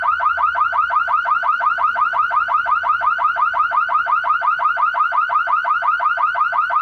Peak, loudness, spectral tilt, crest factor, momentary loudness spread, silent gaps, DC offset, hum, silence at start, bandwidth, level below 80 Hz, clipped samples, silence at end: -8 dBFS; -17 LUFS; -2.5 dB/octave; 10 dB; 1 LU; none; under 0.1%; none; 0 s; 6.2 kHz; -58 dBFS; under 0.1%; 0 s